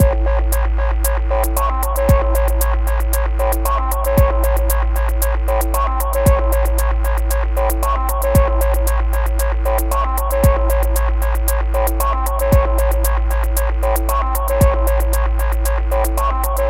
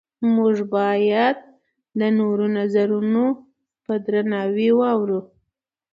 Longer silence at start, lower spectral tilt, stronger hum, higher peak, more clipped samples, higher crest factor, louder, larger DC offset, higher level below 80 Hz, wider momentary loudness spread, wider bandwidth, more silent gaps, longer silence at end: second, 0 s vs 0.2 s; second, -5.5 dB/octave vs -8.5 dB/octave; neither; first, 0 dBFS vs -6 dBFS; neither; about the same, 14 dB vs 16 dB; first, -17 LUFS vs -20 LUFS; neither; first, -16 dBFS vs -70 dBFS; second, 4 LU vs 9 LU; first, 16.5 kHz vs 5.4 kHz; neither; second, 0 s vs 0.7 s